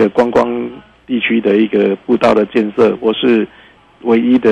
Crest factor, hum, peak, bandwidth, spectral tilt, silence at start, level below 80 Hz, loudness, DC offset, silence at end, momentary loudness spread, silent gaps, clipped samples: 10 dB; none; -2 dBFS; 8.6 kHz; -7 dB/octave; 0 s; -50 dBFS; -13 LUFS; under 0.1%; 0 s; 10 LU; none; under 0.1%